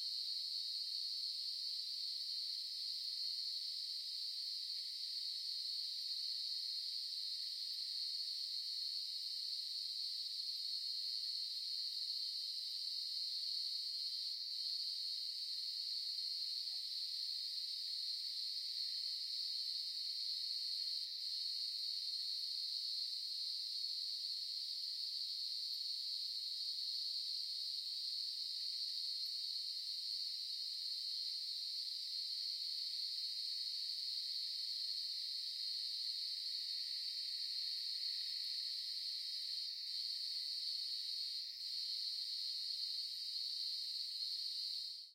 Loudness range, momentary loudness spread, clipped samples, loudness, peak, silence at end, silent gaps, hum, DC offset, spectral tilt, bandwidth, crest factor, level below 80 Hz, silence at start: 1 LU; 2 LU; under 0.1%; -40 LUFS; -30 dBFS; 0 s; none; none; under 0.1%; 4.5 dB/octave; 16.5 kHz; 14 dB; under -90 dBFS; 0 s